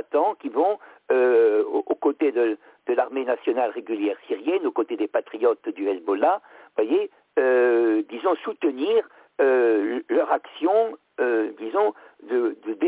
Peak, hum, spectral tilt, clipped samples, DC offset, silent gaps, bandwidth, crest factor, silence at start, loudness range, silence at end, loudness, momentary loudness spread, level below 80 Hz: -8 dBFS; none; -8 dB/octave; under 0.1%; under 0.1%; none; 4 kHz; 14 dB; 0.15 s; 3 LU; 0 s; -23 LUFS; 8 LU; -74 dBFS